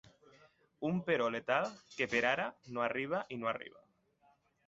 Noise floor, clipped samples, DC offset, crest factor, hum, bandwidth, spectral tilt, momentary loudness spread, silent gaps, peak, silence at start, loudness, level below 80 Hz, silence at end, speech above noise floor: -72 dBFS; under 0.1%; under 0.1%; 22 dB; none; 8 kHz; -3.5 dB/octave; 9 LU; none; -16 dBFS; 0.8 s; -36 LUFS; -74 dBFS; 1 s; 36 dB